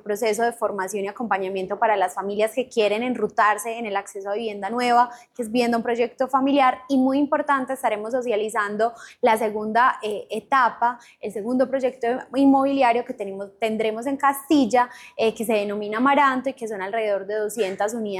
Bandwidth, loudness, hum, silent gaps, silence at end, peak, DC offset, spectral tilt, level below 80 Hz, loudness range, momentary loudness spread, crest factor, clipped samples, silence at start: 15 kHz; -22 LUFS; none; none; 0 s; -8 dBFS; under 0.1%; -4 dB/octave; -66 dBFS; 2 LU; 9 LU; 14 dB; under 0.1%; 0.05 s